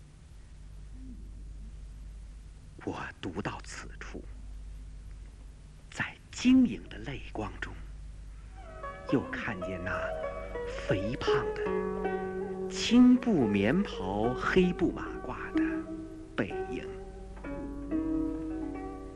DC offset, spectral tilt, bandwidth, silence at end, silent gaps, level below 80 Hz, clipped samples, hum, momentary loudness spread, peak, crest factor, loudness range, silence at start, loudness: under 0.1%; -6 dB/octave; 10 kHz; 0 s; none; -46 dBFS; under 0.1%; none; 22 LU; -12 dBFS; 20 dB; 15 LU; 0 s; -31 LUFS